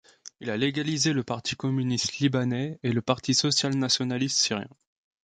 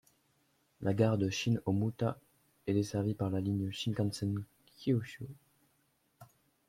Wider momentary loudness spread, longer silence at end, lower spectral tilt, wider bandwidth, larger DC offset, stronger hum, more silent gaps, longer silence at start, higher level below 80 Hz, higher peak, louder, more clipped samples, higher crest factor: second, 7 LU vs 14 LU; about the same, 0.55 s vs 0.45 s; second, -4 dB/octave vs -6.5 dB/octave; second, 9.4 kHz vs 15 kHz; neither; neither; neither; second, 0.25 s vs 0.8 s; first, -62 dBFS vs -68 dBFS; first, -6 dBFS vs -16 dBFS; first, -26 LUFS vs -34 LUFS; neither; about the same, 22 dB vs 20 dB